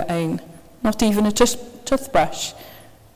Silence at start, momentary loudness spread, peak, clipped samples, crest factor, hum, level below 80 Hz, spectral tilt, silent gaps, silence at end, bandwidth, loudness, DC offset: 0 s; 12 LU; 0 dBFS; under 0.1%; 22 dB; none; -42 dBFS; -4.5 dB/octave; none; 0.3 s; 16 kHz; -21 LUFS; under 0.1%